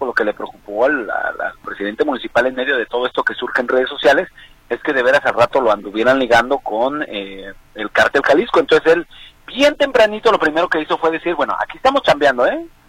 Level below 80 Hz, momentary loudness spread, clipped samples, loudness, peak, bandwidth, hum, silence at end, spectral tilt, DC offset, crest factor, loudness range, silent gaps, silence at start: -48 dBFS; 12 LU; under 0.1%; -16 LUFS; -2 dBFS; 15.5 kHz; none; 0.2 s; -4 dB/octave; under 0.1%; 16 dB; 3 LU; none; 0 s